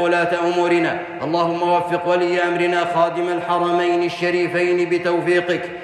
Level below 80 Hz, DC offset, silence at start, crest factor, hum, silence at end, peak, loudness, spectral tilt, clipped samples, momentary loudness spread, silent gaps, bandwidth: -64 dBFS; under 0.1%; 0 s; 14 dB; none; 0 s; -4 dBFS; -19 LUFS; -5.5 dB/octave; under 0.1%; 3 LU; none; 10 kHz